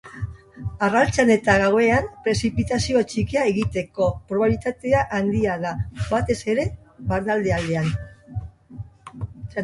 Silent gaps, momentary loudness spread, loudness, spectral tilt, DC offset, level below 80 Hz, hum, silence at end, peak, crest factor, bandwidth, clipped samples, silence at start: none; 17 LU; -22 LUFS; -6 dB/octave; under 0.1%; -40 dBFS; none; 0 s; -4 dBFS; 18 dB; 11.5 kHz; under 0.1%; 0.05 s